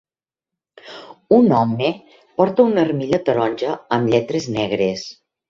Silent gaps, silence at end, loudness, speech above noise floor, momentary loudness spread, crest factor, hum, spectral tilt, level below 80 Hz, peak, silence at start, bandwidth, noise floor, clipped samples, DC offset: none; 0.35 s; -18 LUFS; 70 dB; 20 LU; 18 dB; none; -6.5 dB/octave; -56 dBFS; -2 dBFS; 0.85 s; 7.6 kHz; -87 dBFS; under 0.1%; under 0.1%